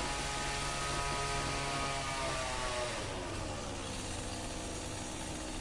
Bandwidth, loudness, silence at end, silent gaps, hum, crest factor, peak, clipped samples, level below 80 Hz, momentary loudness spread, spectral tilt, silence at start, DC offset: 11.5 kHz; -37 LUFS; 0 s; none; none; 16 dB; -22 dBFS; under 0.1%; -46 dBFS; 6 LU; -3 dB/octave; 0 s; under 0.1%